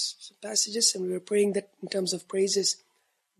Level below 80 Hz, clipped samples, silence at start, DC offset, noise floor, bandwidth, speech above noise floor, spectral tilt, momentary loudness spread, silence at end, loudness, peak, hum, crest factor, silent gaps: -82 dBFS; under 0.1%; 0 s; under 0.1%; -73 dBFS; 14 kHz; 45 dB; -2.5 dB/octave; 10 LU; 0.65 s; -27 LUFS; -10 dBFS; none; 18 dB; none